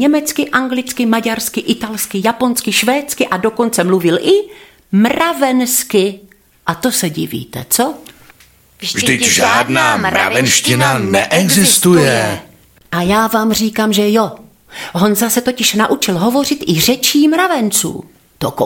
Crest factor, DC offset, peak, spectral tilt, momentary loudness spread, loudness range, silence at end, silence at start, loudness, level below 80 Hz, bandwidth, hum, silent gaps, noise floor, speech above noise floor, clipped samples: 14 dB; under 0.1%; 0 dBFS; -3.5 dB/octave; 11 LU; 4 LU; 0 s; 0 s; -13 LUFS; -48 dBFS; 17 kHz; none; none; -46 dBFS; 33 dB; under 0.1%